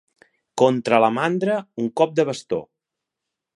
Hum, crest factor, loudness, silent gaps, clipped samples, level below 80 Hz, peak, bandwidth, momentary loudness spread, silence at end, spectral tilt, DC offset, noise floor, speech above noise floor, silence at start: none; 20 dB; -21 LUFS; none; under 0.1%; -68 dBFS; -2 dBFS; 11.5 kHz; 11 LU; 0.9 s; -6 dB/octave; under 0.1%; -84 dBFS; 64 dB; 0.55 s